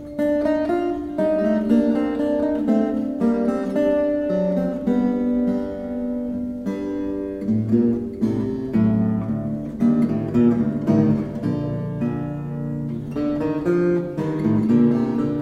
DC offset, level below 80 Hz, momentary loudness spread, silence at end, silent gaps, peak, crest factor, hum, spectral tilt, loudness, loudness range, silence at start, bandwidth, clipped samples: under 0.1%; -46 dBFS; 8 LU; 0 s; none; -6 dBFS; 14 dB; none; -9.5 dB/octave; -21 LUFS; 3 LU; 0 s; 6.8 kHz; under 0.1%